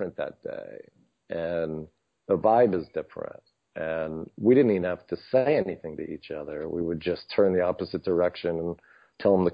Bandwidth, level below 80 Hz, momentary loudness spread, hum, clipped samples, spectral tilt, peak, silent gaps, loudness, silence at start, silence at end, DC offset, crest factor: 5.2 kHz; -56 dBFS; 17 LU; none; under 0.1%; -10 dB/octave; -8 dBFS; none; -27 LUFS; 0 s; 0 s; under 0.1%; 18 dB